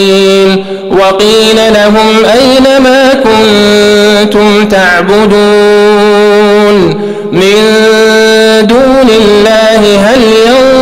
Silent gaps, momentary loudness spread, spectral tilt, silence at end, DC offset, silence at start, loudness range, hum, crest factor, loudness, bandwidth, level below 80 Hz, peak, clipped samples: none; 2 LU; -4.5 dB/octave; 0 s; under 0.1%; 0 s; 1 LU; none; 4 dB; -4 LUFS; 16 kHz; -32 dBFS; 0 dBFS; under 0.1%